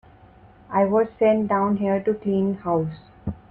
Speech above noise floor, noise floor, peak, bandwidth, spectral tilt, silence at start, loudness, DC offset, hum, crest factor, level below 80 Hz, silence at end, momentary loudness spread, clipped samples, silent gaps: 29 dB; -50 dBFS; -8 dBFS; 4.3 kHz; -10.5 dB/octave; 0.7 s; -22 LUFS; under 0.1%; none; 16 dB; -52 dBFS; 0.15 s; 13 LU; under 0.1%; none